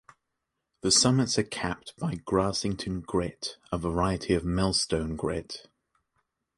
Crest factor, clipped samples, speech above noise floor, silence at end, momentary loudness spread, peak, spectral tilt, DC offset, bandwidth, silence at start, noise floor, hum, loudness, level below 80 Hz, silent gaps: 20 dB; under 0.1%; 55 dB; 1 s; 12 LU; -10 dBFS; -4 dB/octave; under 0.1%; 11.5 kHz; 0.85 s; -83 dBFS; none; -28 LUFS; -46 dBFS; none